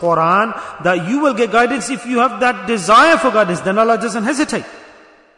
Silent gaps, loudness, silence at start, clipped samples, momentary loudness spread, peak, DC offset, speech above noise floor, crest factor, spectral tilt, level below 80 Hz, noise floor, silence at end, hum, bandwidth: none; -14 LUFS; 0 s; under 0.1%; 10 LU; 0 dBFS; under 0.1%; 30 dB; 14 dB; -4.5 dB/octave; -52 dBFS; -45 dBFS; 0.5 s; none; 11 kHz